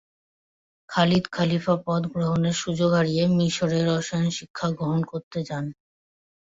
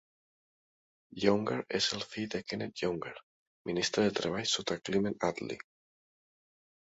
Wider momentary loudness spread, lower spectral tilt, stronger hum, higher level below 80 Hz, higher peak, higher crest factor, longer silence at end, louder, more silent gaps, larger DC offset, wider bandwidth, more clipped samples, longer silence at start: second, 9 LU vs 15 LU; first, -6 dB/octave vs -4 dB/octave; neither; first, -58 dBFS vs -66 dBFS; first, -6 dBFS vs -12 dBFS; second, 18 dB vs 24 dB; second, 0.85 s vs 1.3 s; first, -24 LUFS vs -33 LUFS; second, 4.50-4.54 s, 5.23-5.31 s vs 3.23-3.65 s; neither; about the same, 7.8 kHz vs 8 kHz; neither; second, 0.9 s vs 1.15 s